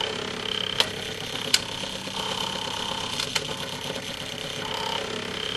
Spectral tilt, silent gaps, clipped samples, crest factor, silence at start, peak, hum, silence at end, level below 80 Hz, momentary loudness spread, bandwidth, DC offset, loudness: -2 dB/octave; none; under 0.1%; 28 dB; 0 s; 0 dBFS; none; 0 s; -54 dBFS; 8 LU; 15.5 kHz; under 0.1%; -27 LUFS